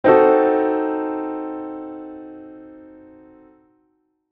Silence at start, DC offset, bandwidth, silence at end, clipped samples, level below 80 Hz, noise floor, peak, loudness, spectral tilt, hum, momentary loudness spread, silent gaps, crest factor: 0.05 s; under 0.1%; 4.8 kHz; 1.5 s; under 0.1%; -64 dBFS; -67 dBFS; -2 dBFS; -19 LUFS; -9.5 dB/octave; none; 26 LU; none; 20 dB